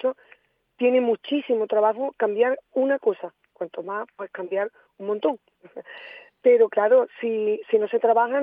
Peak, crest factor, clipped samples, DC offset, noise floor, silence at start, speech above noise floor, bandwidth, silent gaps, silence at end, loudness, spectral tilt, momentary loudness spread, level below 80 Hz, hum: -8 dBFS; 16 dB; under 0.1%; under 0.1%; -58 dBFS; 0.05 s; 35 dB; 3.8 kHz; none; 0 s; -23 LUFS; -8 dB/octave; 19 LU; -84 dBFS; none